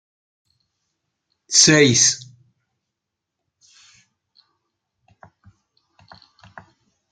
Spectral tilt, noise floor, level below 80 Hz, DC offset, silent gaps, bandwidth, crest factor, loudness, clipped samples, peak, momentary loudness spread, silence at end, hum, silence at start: -2 dB/octave; -82 dBFS; -62 dBFS; under 0.1%; none; 10.5 kHz; 24 dB; -14 LUFS; under 0.1%; 0 dBFS; 7 LU; 4.95 s; none; 1.5 s